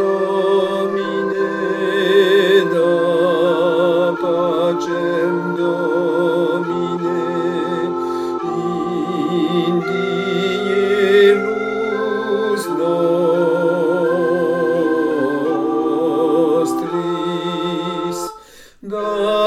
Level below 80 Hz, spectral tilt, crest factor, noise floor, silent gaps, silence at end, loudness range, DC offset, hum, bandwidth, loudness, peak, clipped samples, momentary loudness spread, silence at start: -60 dBFS; -6 dB/octave; 16 dB; -42 dBFS; none; 0 s; 4 LU; under 0.1%; none; 14.5 kHz; -17 LUFS; -2 dBFS; under 0.1%; 7 LU; 0 s